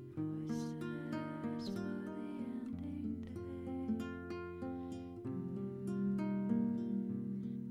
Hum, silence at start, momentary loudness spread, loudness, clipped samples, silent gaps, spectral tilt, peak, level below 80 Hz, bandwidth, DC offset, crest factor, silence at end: none; 0 s; 8 LU; -41 LUFS; under 0.1%; none; -8 dB/octave; -24 dBFS; -66 dBFS; 12 kHz; under 0.1%; 16 dB; 0 s